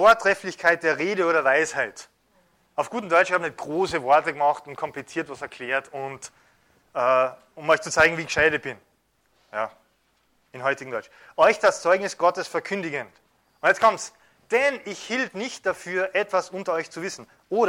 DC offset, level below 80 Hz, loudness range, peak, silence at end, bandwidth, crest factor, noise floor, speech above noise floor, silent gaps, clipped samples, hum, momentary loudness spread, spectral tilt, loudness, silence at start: under 0.1%; -60 dBFS; 3 LU; -6 dBFS; 0 s; 16 kHz; 18 dB; -67 dBFS; 44 dB; none; under 0.1%; none; 15 LU; -3.5 dB/octave; -23 LUFS; 0 s